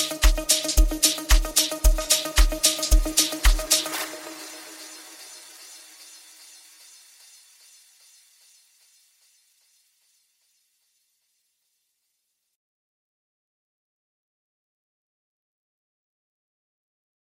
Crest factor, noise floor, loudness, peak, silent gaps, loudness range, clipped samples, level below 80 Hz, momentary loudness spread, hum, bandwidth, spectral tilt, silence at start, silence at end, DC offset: 24 dB; -77 dBFS; -21 LUFS; -2 dBFS; none; 24 LU; under 0.1%; -28 dBFS; 23 LU; none; 16.5 kHz; -2 dB/octave; 0 s; 11.45 s; under 0.1%